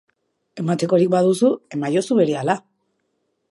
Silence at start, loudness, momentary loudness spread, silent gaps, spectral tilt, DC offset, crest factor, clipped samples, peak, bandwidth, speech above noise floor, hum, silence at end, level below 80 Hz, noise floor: 0.55 s; -19 LUFS; 8 LU; none; -6.5 dB/octave; under 0.1%; 18 dB; under 0.1%; -2 dBFS; 11.5 kHz; 53 dB; none; 0.9 s; -70 dBFS; -71 dBFS